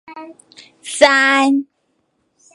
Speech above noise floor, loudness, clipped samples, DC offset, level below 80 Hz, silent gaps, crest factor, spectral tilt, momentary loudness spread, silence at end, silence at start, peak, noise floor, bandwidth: 50 dB; -13 LUFS; under 0.1%; under 0.1%; -62 dBFS; none; 18 dB; -1 dB/octave; 25 LU; 0.9 s; 0.1 s; 0 dBFS; -66 dBFS; 11.5 kHz